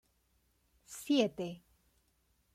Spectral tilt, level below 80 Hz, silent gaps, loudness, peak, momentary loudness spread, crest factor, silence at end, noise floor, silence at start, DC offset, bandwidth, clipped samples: -4.5 dB/octave; -74 dBFS; none; -34 LUFS; -18 dBFS; 20 LU; 22 dB; 0.95 s; -75 dBFS; 0.9 s; under 0.1%; 16 kHz; under 0.1%